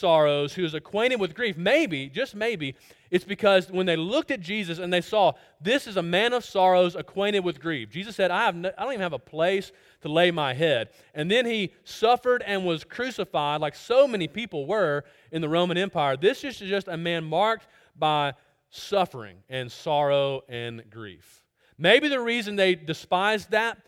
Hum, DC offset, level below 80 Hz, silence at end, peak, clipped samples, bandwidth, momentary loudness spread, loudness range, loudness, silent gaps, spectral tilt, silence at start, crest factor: none; under 0.1%; -66 dBFS; 0.1 s; -4 dBFS; under 0.1%; 16 kHz; 11 LU; 3 LU; -25 LUFS; none; -5 dB/octave; 0 s; 20 dB